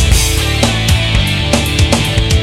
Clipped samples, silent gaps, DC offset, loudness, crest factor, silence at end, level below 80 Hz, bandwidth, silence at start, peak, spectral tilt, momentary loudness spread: under 0.1%; none; under 0.1%; -12 LUFS; 12 dB; 0 s; -16 dBFS; 16.5 kHz; 0 s; 0 dBFS; -4 dB/octave; 1 LU